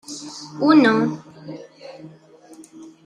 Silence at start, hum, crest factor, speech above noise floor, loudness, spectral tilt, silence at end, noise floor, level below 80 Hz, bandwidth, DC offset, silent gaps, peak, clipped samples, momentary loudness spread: 0.1 s; none; 20 dB; 29 dB; -17 LUFS; -5.5 dB/octave; 0.2 s; -47 dBFS; -68 dBFS; 10.5 kHz; under 0.1%; none; -2 dBFS; under 0.1%; 26 LU